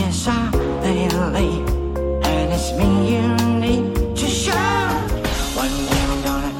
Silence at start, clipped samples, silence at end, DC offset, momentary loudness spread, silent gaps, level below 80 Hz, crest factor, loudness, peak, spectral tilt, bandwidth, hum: 0 s; under 0.1%; 0 s; under 0.1%; 4 LU; none; -26 dBFS; 14 dB; -19 LUFS; -4 dBFS; -5 dB/octave; 17 kHz; none